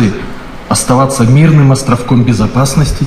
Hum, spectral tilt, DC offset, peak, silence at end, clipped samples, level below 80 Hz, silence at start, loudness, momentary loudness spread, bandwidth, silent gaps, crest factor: none; -6 dB/octave; under 0.1%; 0 dBFS; 0 s; under 0.1%; -26 dBFS; 0 s; -9 LUFS; 12 LU; 14.5 kHz; none; 8 dB